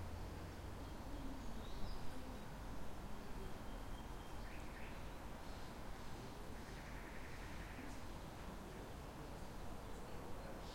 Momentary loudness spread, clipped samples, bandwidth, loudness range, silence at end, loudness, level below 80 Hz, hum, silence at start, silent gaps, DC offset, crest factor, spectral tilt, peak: 2 LU; under 0.1%; 16.5 kHz; 1 LU; 0 s; -53 LUFS; -54 dBFS; none; 0 s; none; under 0.1%; 16 dB; -5.5 dB/octave; -32 dBFS